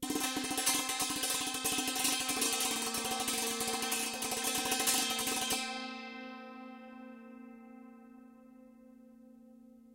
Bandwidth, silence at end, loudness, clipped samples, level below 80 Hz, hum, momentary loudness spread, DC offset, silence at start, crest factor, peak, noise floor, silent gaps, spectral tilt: 17 kHz; 0.05 s; -32 LUFS; under 0.1%; -68 dBFS; none; 20 LU; under 0.1%; 0 s; 20 dB; -16 dBFS; -57 dBFS; none; -0.5 dB/octave